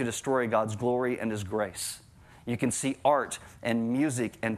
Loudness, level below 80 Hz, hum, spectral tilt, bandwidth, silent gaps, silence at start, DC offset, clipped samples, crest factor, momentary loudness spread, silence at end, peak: -29 LUFS; -64 dBFS; none; -5 dB/octave; 15.5 kHz; none; 0 s; under 0.1%; under 0.1%; 20 dB; 10 LU; 0 s; -10 dBFS